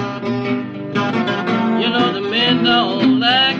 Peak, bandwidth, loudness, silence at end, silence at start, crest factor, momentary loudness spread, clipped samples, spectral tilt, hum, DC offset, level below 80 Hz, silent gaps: -2 dBFS; 7.2 kHz; -16 LUFS; 0 s; 0 s; 16 dB; 9 LU; under 0.1%; -6 dB/octave; none; under 0.1%; -58 dBFS; none